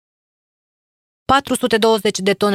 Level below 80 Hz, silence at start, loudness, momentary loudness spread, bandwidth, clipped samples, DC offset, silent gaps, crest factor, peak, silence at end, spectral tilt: -48 dBFS; 1.3 s; -16 LUFS; 3 LU; 16 kHz; under 0.1%; under 0.1%; none; 18 dB; 0 dBFS; 0 s; -3.5 dB/octave